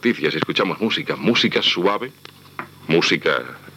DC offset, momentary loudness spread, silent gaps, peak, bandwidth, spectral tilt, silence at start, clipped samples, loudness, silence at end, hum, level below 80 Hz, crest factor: under 0.1%; 17 LU; none; 0 dBFS; 16 kHz; -4.5 dB/octave; 0.05 s; under 0.1%; -19 LUFS; 0.05 s; none; -70 dBFS; 20 dB